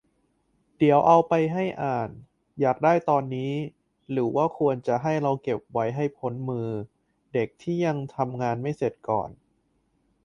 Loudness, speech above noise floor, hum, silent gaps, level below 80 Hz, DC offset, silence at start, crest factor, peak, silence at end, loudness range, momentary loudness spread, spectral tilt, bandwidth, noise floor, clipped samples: -25 LUFS; 45 dB; none; none; -62 dBFS; under 0.1%; 0.8 s; 20 dB; -6 dBFS; 0.9 s; 6 LU; 12 LU; -8 dB/octave; 9.6 kHz; -70 dBFS; under 0.1%